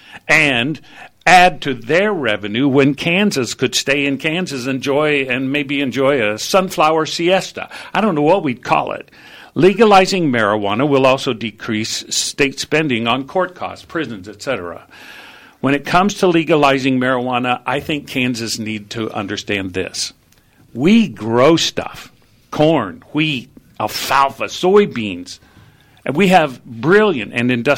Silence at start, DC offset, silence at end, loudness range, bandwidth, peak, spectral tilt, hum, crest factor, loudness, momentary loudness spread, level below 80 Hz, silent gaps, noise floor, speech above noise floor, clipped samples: 0.1 s; under 0.1%; 0 s; 5 LU; 17 kHz; 0 dBFS; -4.5 dB/octave; none; 16 dB; -16 LUFS; 12 LU; -50 dBFS; none; -51 dBFS; 35 dB; under 0.1%